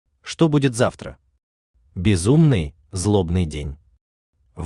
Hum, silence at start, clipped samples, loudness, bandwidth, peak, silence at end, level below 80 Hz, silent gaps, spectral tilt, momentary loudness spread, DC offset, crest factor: none; 0.25 s; under 0.1%; -20 LUFS; 12 kHz; -4 dBFS; 0 s; -40 dBFS; 1.43-1.74 s, 4.01-4.33 s; -6.5 dB/octave; 19 LU; under 0.1%; 18 dB